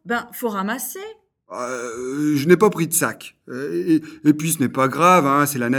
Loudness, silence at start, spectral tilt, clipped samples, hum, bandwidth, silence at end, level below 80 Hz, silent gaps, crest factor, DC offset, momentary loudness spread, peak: -19 LUFS; 0.05 s; -5 dB/octave; under 0.1%; none; 18.5 kHz; 0 s; -64 dBFS; none; 20 dB; under 0.1%; 16 LU; 0 dBFS